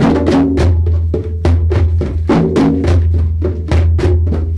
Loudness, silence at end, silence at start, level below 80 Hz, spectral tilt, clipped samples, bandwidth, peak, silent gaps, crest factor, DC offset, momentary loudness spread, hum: -13 LUFS; 0 s; 0 s; -18 dBFS; -8.5 dB/octave; under 0.1%; 7.6 kHz; 0 dBFS; none; 12 dB; under 0.1%; 5 LU; none